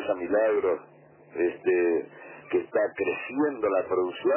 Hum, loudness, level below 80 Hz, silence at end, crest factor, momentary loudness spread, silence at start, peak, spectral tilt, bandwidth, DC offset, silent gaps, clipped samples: none; -27 LUFS; -68 dBFS; 0 s; 14 dB; 7 LU; 0 s; -12 dBFS; -9.5 dB/octave; 3.2 kHz; under 0.1%; none; under 0.1%